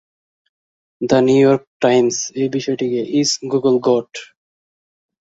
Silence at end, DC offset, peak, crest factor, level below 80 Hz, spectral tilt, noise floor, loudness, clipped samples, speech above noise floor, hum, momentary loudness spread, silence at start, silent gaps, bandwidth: 1.05 s; under 0.1%; 0 dBFS; 18 dB; -60 dBFS; -4.5 dB/octave; under -90 dBFS; -16 LUFS; under 0.1%; over 74 dB; none; 7 LU; 1 s; 1.67-1.80 s; 8 kHz